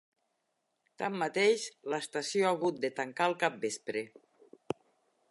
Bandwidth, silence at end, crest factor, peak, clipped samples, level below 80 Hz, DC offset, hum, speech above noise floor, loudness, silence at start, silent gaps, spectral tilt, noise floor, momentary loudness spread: 11.5 kHz; 1.25 s; 22 dB; -12 dBFS; under 0.1%; -82 dBFS; under 0.1%; none; 49 dB; -33 LUFS; 1 s; none; -3.5 dB/octave; -81 dBFS; 14 LU